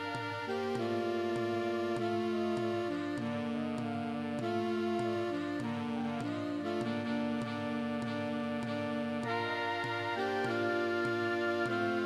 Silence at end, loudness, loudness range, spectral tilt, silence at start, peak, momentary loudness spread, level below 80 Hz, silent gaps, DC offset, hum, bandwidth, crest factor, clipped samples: 0 s; -35 LUFS; 2 LU; -6 dB/octave; 0 s; -20 dBFS; 4 LU; -74 dBFS; none; under 0.1%; none; 12.5 kHz; 14 dB; under 0.1%